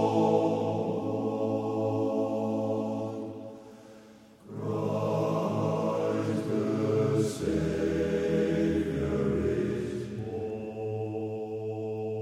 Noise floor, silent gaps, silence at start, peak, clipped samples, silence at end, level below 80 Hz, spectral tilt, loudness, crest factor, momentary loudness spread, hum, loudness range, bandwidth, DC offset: -53 dBFS; none; 0 s; -12 dBFS; under 0.1%; 0 s; -52 dBFS; -7.5 dB/octave; -30 LUFS; 16 dB; 9 LU; none; 5 LU; 14 kHz; under 0.1%